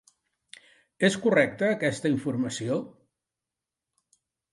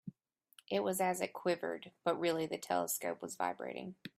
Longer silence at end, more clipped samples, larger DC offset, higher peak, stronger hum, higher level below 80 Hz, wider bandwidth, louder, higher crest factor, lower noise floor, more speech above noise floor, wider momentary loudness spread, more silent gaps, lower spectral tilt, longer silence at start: first, 1.65 s vs 0.1 s; neither; neither; first, -8 dBFS vs -20 dBFS; neither; first, -70 dBFS vs -82 dBFS; second, 11.5 kHz vs 16 kHz; first, -26 LUFS vs -37 LUFS; about the same, 22 dB vs 18 dB; first, -89 dBFS vs -67 dBFS; first, 63 dB vs 30 dB; about the same, 8 LU vs 9 LU; neither; about the same, -5 dB/octave vs -4 dB/octave; first, 1 s vs 0.05 s